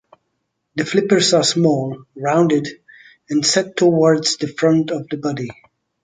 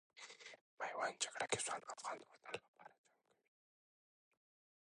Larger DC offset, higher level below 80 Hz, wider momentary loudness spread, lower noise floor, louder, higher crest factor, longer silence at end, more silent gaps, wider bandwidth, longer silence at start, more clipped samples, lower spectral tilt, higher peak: neither; first, -62 dBFS vs -86 dBFS; second, 12 LU vs 19 LU; second, -73 dBFS vs under -90 dBFS; first, -17 LUFS vs -45 LUFS; second, 16 dB vs 26 dB; second, 0.5 s vs 1.9 s; second, none vs 0.61-0.77 s, 2.68-2.74 s; second, 9.6 kHz vs 11 kHz; first, 0.75 s vs 0.15 s; neither; first, -4.5 dB/octave vs -1 dB/octave; first, -2 dBFS vs -24 dBFS